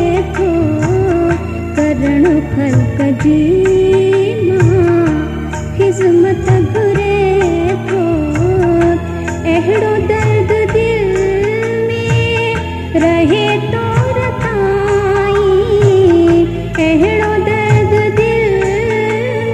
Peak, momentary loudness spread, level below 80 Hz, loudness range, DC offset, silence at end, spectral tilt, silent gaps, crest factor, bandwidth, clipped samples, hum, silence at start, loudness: 0 dBFS; 5 LU; -28 dBFS; 2 LU; under 0.1%; 0 s; -7 dB/octave; none; 12 dB; 11.5 kHz; under 0.1%; none; 0 s; -12 LUFS